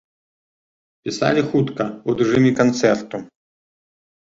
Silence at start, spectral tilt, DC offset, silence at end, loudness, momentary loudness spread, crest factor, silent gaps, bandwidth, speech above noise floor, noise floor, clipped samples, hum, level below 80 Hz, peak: 1.05 s; -6 dB/octave; under 0.1%; 0.95 s; -19 LUFS; 15 LU; 20 dB; none; 7.8 kHz; over 72 dB; under -90 dBFS; under 0.1%; none; -56 dBFS; -2 dBFS